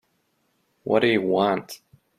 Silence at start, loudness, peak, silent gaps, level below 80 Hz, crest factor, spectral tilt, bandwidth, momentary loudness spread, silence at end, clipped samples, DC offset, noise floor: 0.85 s; -22 LUFS; -6 dBFS; none; -66 dBFS; 20 dB; -5.5 dB/octave; 15.5 kHz; 20 LU; 0.4 s; under 0.1%; under 0.1%; -70 dBFS